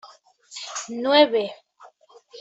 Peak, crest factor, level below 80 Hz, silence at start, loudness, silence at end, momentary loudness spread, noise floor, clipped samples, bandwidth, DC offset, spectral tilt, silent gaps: -4 dBFS; 20 dB; -76 dBFS; 0.05 s; -21 LUFS; 0 s; 19 LU; -52 dBFS; under 0.1%; 8.2 kHz; under 0.1%; -2 dB/octave; none